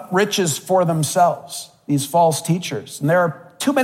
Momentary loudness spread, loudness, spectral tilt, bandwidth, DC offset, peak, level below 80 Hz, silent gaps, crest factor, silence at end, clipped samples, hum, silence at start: 9 LU; -19 LUFS; -4.5 dB/octave; 16.5 kHz; under 0.1%; -4 dBFS; -68 dBFS; none; 16 dB; 0 s; under 0.1%; none; 0 s